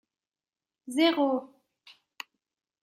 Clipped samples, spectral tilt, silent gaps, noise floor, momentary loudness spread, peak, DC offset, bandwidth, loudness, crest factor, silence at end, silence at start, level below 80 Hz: under 0.1%; -2.5 dB/octave; none; under -90 dBFS; 21 LU; -12 dBFS; under 0.1%; 16 kHz; -27 LUFS; 20 dB; 1.35 s; 0.85 s; -88 dBFS